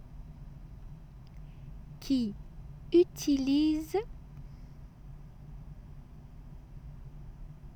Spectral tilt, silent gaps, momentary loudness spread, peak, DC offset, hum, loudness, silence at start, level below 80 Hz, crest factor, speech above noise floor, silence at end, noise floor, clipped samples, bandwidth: -6 dB/octave; none; 24 LU; -14 dBFS; under 0.1%; none; -29 LUFS; 0 s; -48 dBFS; 20 dB; 21 dB; 0 s; -48 dBFS; under 0.1%; 19 kHz